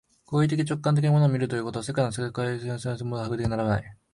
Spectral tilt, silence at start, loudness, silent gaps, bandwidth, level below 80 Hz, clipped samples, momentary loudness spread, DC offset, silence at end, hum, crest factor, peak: -7 dB/octave; 0.3 s; -26 LUFS; none; 11.5 kHz; -52 dBFS; under 0.1%; 9 LU; under 0.1%; 0.2 s; none; 14 dB; -10 dBFS